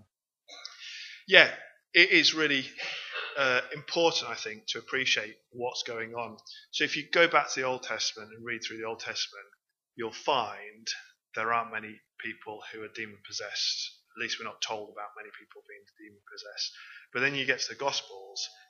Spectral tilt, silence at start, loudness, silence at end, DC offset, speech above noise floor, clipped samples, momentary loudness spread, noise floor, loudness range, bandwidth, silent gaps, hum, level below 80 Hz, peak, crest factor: -2 dB/octave; 0.5 s; -28 LUFS; 0.2 s; under 0.1%; 36 dB; under 0.1%; 20 LU; -66 dBFS; 11 LU; 7.4 kHz; none; none; -86 dBFS; 0 dBFS; 32 dB